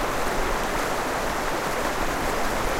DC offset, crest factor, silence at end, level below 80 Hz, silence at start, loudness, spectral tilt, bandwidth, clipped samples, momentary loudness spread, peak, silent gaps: under 0.1%; 14 dB; 0 s; -34 dBFS; 0 s; -26 LUFS; -3.5 dB/octave; 16 kHz; under 0.1%; 1 LU; -12 dBFS; none